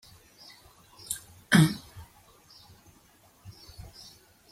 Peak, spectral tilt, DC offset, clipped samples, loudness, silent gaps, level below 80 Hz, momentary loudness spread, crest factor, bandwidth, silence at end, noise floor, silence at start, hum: -8 dBFS; -4.5 dB/octave; under 0.1%; under 0.1%; -26 LUFS; none; -60 dBFS; 29 LU; 24 dB; 16 kHz; 2.5 s; -60 dBFS; 1.1 s; none